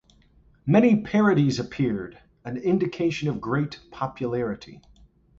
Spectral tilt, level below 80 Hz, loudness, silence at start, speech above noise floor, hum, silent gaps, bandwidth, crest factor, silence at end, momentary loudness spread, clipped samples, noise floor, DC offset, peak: -7.5 dB/octave; -56 dBFS; -24 LUFS; 0.65 s; 34 dB; none; none; 7.6 kHz; 18 dB; 0.6 s; 15 LU; under 0.1%; -58 dBFS; under 0.1%; -6 dBFS